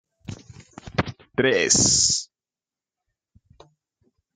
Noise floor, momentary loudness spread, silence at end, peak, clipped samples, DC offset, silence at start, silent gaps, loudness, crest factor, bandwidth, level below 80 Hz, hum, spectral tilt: under -90 dBFS; 25 LU; 2.1 s; -4 dBFS; under 0.1%; under 0.1%; 0.3 s; none; -20 LUFS; 22 dB; 11 kHz; -52 dBFS; none; -2 dB/octave